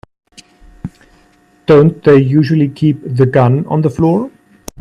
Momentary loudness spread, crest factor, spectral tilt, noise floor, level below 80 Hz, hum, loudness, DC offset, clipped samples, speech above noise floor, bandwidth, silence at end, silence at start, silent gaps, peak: 21 LU; 12 dB; -9 dB/octave; -50 dBFS; -44 dBFS; none; -11 LUFS; under 0.1%; under 0.1%; 40 dB; 10.5 kHz; 0.55 s; 0.85 s; none; 0 dBFS